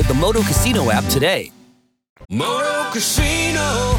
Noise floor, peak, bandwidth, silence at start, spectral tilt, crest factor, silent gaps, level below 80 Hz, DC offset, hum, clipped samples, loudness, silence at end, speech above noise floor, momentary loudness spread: -53 dBFS; -4 dBFS; 20 kHz; 0 s; -4 dB/octave; 14 dB; 2.10-2.16 s; -28 dBFS; under 0.1%; none; under 0.1%; -17 LUFS; 0 s; 36 dB; 7 LU